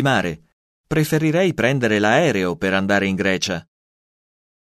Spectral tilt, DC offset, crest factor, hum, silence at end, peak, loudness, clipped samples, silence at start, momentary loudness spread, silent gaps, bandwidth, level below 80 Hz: -5.5 dB/octave; under 0.1%; 18 dB; none; 1.1 s; -2 dBFS; -19 LUFS; under 0.1%; 0 s; 8 LU; 0.53-0.84 s; 13.5 kHz; -50 dBFS